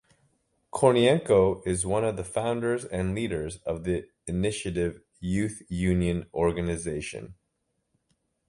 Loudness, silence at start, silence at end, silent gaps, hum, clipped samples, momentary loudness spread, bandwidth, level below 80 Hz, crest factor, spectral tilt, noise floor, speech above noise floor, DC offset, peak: -27 LUFS; 0.75 s; 1.15 s; none; none; under 0.1%; 11 LU; 11.5 kHz; -46 dBFS; 22 dB; -5.5 dB/octave; -77 dBFS; 51 dB; under 0.1%; -6 dBFS